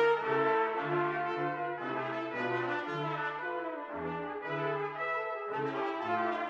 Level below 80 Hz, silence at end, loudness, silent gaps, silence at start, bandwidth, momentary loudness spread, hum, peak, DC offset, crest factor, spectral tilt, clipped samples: -78 dBFS; 0 s; -34 LUFS; none; 0 s; 7.4 kHz; 8 LU; none; -18 dBFS; under 0.1%; 16 dB; -7 dB/octave; under 0.1%